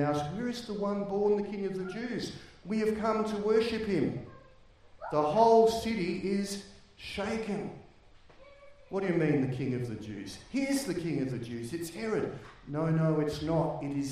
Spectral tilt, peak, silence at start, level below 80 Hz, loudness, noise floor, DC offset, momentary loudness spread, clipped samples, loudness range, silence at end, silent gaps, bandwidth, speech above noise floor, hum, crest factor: -6.5 dB/octave; -12 dBFS; 0 s; -58 dBFS; -31 LUFS; -57 dBFS; under 0.1%; 13 LU; under 0.1%; 6 LU; 0 s; none; 15.5 kHz; 27 dB; none; 20 dB